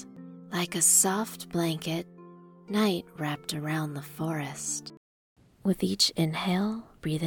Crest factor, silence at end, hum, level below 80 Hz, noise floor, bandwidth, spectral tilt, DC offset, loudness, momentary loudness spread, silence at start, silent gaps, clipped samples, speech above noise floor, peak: 20 dB; 0 s; none; -62 dBFS; -50 dBFS; 20 kHz; -3.5 dB/octave; under 0.1%; -28 LUFS; 14 LU; 0 s; 4.97-5.36 s; under 0.1%; 22 dB; -10 dBFS